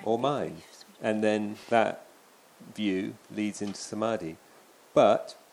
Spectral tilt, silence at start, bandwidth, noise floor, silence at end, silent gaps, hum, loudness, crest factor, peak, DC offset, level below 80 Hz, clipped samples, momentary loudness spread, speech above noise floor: -5 dB/octave; 0 s; 15.5 kHz; -57 dBFS; 0.2 s; none; none; -29 LUFS; 22 dB; -8 dBFS; under 0.1%; -72 dBFS; under 0.1%; 16 LU; 29 dB